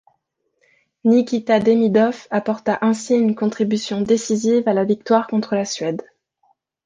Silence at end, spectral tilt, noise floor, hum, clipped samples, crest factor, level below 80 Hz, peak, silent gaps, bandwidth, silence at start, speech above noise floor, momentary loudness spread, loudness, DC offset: 0.85 s; -5.5 dB/octave; -70 dBFS; none; under 0.1%; 16 dB; -62 dBFS; -2 dBFS; none; 9.6 kHz; 1.05 s; 52 dB; 7 LU; -19 LUFS; under 0.1%